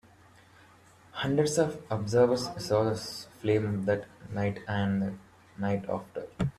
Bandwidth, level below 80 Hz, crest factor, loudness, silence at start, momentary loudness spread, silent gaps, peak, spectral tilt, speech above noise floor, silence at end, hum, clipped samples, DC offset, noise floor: 14 kHz; -58 dBFS; 18 dB; -30 LUFS; 1.15 s; 11 LU; none; -12 dBFS; -6 dB/octave; 28 dB; 0.05 s; none; under 0.1%; under 0.1%; -57 dBFS